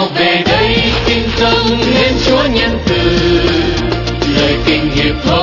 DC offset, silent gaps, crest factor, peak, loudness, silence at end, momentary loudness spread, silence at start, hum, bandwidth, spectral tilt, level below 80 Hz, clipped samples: under 0.1%; none; 12 dB; 0 dBFS; -11 LUFS; 0 s; 3 LU; 0 s; none; 6 kHz; -5.5 dB/octave; -24 dBFS; under 0.1%